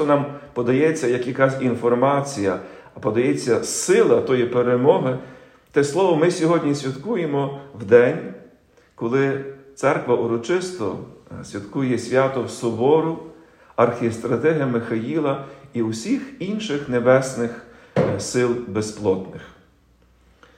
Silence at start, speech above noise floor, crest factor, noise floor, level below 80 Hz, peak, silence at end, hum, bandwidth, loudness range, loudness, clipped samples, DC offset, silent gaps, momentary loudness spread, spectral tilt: 0 s; 36 dB; 20 dB; -56 dBFS; -60 dBFS; -2 dBFS; 1.05 s; none; 13.5 kHz; 4 LU; -21 LUFS; under 0.1%; under 0.1%; none; 13 LU; -5.5 dB/octave